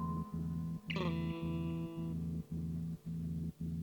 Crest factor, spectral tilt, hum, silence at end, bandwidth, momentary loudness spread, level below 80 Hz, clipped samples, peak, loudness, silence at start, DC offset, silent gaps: 14 dB; -8 dB/octave; none; 0 s; 19 kHz; 4 LU; -54 dBFS; under 0.1%; -24 dBFS; -41 LUFS; 0 s; under 0.1%; none